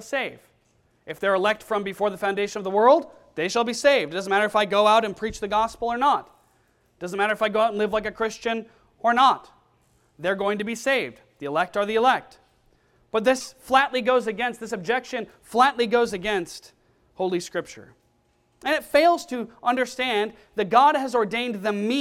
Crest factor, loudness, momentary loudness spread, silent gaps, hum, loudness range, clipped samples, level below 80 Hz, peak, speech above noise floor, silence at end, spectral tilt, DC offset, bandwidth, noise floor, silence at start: 20 dB; -23 LUFS; 12 LU; none; none; 4 LU; under 0.1%; -58 dBFS; -4 dBFS; 43 dB; 0 s; -4 dB/octave; under 0.1%; 16 kHz; -65 dBFS; 0 s